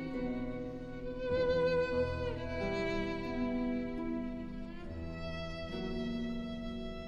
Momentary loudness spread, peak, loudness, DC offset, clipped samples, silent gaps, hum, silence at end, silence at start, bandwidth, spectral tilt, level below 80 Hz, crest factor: 11 LU; -22 dBFS; -37 LUFS; under 0.1%; under 0.1%; none; none; 0 s; 0 s; 8.4 kHz; -7 dB/octave; -48 dBFS; 14 dB